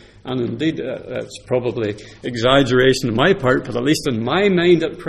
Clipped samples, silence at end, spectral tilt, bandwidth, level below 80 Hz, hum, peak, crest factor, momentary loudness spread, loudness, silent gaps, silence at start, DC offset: under 0.1%; 0 s; -5.5 dB/octave; 13.5 kHz; -44 dBFS; none; 0 dBFS; 18 dB; 13 LU; -18 LUFS; none; 0.25 s; under 0.1%